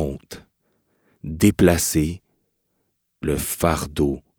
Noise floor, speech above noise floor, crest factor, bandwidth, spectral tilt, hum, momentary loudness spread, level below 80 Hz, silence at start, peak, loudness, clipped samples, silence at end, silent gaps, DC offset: -72 dBFS; 53 dB; 20 dB; over 20 kHz; -5 dB/octave; none; 22 LU; -38 dBFS; 0 s; -2 dBFS; -21 LUFS; under 0.1%; 0.2 s; none; under 0.1%